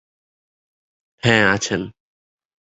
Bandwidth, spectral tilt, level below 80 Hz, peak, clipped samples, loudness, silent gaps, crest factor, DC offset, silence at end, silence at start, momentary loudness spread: 8.2 kHz; -4 dB/octave; -52 dBFS; -2 dBFS; under 0.1%; -18 LUFS; none; 22 dB; under 0.1%; 0.8 s; 1.25 s; 12 LU